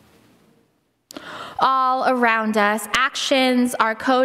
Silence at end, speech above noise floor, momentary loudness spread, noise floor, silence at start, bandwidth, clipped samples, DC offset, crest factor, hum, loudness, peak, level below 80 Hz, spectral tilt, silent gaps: 0 s; 46 dB; 15 LU; -65 dBFS; 1.15 s; 16 kHz; under 0.1%; under 0.1%; 18 dB; none; -18 LUFS; -2 dBFS; -60 dBFS; -3 dB/octave; none